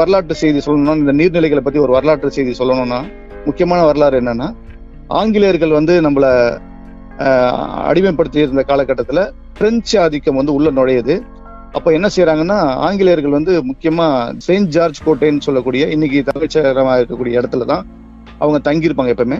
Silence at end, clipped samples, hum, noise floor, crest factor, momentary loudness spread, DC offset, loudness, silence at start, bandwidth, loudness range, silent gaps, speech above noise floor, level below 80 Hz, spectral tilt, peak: 0 s; under 0.1%; none; -33 dBFS; 12 dB; 7 LU; under 0.1%; -14 LUFS; 0 s; 7.8 kHz; 2 LU; none; 20 dB; -36 dBFS; -6.5 dB/octave; 0 dBFS